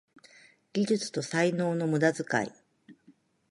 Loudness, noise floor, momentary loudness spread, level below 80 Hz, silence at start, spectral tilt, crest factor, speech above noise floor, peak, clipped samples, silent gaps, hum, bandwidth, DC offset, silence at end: -29 LUFS; -63 dBFS; 5 LU; -74 dBFS; 0.75 s; -5.5 dB/octave; 20 dB; 35 dB; -12 dBFS; under 0.1%; none; none; 11.5 kHz; under 0.1%; 0.6 s